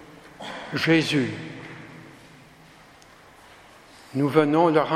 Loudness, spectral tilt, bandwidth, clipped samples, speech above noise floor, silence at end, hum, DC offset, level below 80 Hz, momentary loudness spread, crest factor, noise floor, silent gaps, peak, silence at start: -22 LUFS; -6 dB/octave; 14.5 kHz; under 0.1%; 30 dB; 0 s; none; under 0.1%; -64 dBFS; 22 LU; 22 dB; -50 dBFS; none; -2 dBFS; 0 s